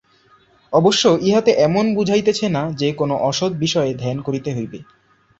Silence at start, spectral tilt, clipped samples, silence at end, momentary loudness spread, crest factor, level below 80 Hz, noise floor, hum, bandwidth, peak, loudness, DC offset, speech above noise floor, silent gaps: 0.7 s; -5 dB/octave; under 0.1%; 0.55 s; 9 LU; 16 dB; -54 dBFS; -54 dBFS; none; 8.2 kHz; -2 dBFS; -18 LUFS; under 0.1%; 37 dB; none